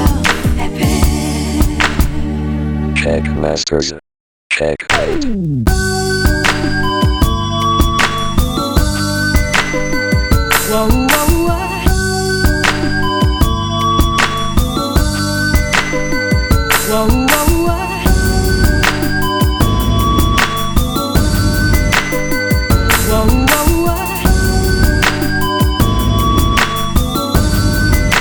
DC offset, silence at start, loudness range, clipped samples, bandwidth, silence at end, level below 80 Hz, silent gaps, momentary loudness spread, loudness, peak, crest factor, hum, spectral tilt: under 0.1%; 0 s; 3 LU; under 0.1%; over 20 kHz; 0 s; -18 dBFS; 4.20-4.50 s; 4 LU; -14 LUFS; 0 dBFS; 12 dB; none; -4.5 dB/octave